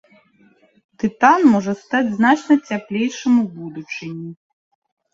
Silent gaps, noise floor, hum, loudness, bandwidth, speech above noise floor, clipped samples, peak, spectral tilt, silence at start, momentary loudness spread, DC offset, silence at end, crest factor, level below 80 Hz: none; -55 dBFS; none; -17 LUFS; 7.8 kHz; 38 dB; under 0.1%; 0 dBFS; -5.5 dB/octave; 1.05 s; 16 LU; under 0.1%; 0.8 s; 18 dB; -64 dBFS